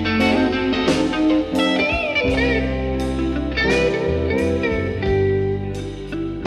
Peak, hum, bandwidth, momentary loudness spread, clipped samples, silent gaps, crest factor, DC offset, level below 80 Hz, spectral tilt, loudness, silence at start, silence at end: -4 dBFS; none; 13 kHz; 6 LU; under 0.1%; none; 14 dB; under 0.1%; -32 dBFS; -6 dB/octave; -19 LUFS; 0 s; 0 s